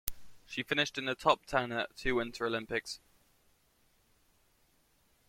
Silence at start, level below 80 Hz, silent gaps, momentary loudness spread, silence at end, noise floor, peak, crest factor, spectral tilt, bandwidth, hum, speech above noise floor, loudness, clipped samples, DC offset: 0.05 s; -56 dBFS; none; 12 LU; 2.3 s; -71 dBFS; -8 dBFS; 28 dB; -3.5 dB/octave; 16.5 kHz; none; 37 dB; -34 LUFS; under 0.1%; under 0.1%